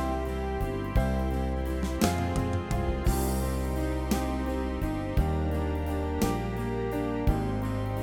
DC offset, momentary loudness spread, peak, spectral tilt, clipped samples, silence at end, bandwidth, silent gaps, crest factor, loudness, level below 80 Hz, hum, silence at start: under 0.1%; 3 LU; -8 dBFS; -6.5 dB/octave; under 0.1%; 0 s; 18.5 kHz; none; 22 dB; -30 LUFS; -32 dBFS; none; 0 s